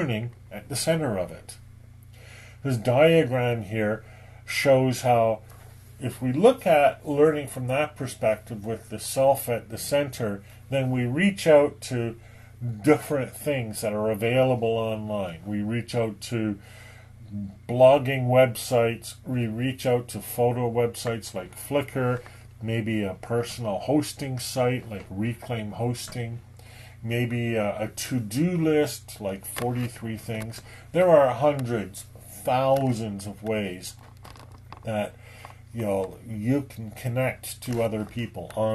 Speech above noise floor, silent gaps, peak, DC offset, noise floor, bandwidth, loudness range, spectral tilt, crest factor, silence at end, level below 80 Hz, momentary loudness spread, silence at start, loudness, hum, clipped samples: 22 dB; none; -4 dBFS; under 0.1%; -47 dBFS; 13 kHz; 7 LU; -6 dB/octave; 22 dB; 0 s; -54 dBFS; 17 LU; 0 s; -25 LUFS; none; under 0.1%